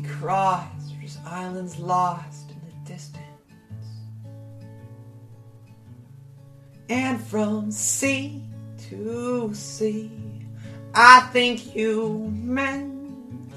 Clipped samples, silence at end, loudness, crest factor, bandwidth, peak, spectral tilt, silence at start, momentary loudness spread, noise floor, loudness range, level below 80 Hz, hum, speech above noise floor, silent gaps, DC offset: under 0.1%; 0 s; -21 LUFS; 24 dB; 14 kHz; 0 dBFS; -3.5 dB/octave; 0 s; 20 LU; -47 dBFS; 23 LU; -64 dBFS; none; 25 dB; none; under 0.1%